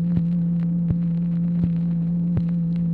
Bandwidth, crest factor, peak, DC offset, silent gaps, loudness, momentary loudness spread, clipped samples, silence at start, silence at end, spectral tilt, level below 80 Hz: 2.3 kHz; 12 dB; -10 dBFS; under 0.1%; none; -22 LUFS; 1 LU; under 0.1%; 0 s; 0 s; -12.5 dB/octave; -44 dBFS